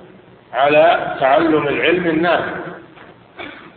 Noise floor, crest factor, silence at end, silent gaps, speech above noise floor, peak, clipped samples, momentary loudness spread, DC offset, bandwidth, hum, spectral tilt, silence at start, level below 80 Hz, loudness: -43 dBFS; 16 dB; 0.1 s; none; 29 dB; -2 dBFS; under 0.1%; 20 LU; under 0.1%; 4.6 kHz; none; -9 dB/octave; 0.5 s; -52 dBFS; -15 LUFS